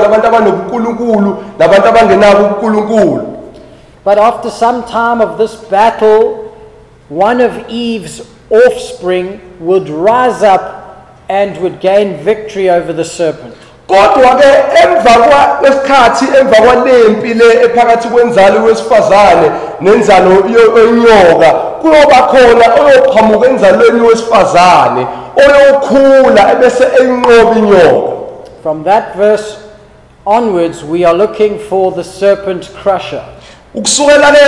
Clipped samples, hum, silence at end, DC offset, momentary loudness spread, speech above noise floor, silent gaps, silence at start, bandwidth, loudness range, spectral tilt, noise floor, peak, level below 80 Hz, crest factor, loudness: 0.4%; none; 0 s; under 0.1%; 11 LU; 32 dB; none; 0 s; 12 kHz; 7 LU; -4.5 dB/octave; -38 dBFS; 0 dBFS; -38 dBFS; 8 dB; -7 LUFS